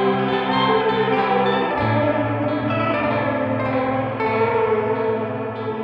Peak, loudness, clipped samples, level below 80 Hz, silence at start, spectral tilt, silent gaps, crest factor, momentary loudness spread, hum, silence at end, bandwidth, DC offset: -6 dBFS; -20 LUFS; under 0.1%; -50 dBFS; 0 s; -8.5 dB/octave; none; 14 dB; 4 LU; none; 0 s; 5.6 kHz; under 0.1%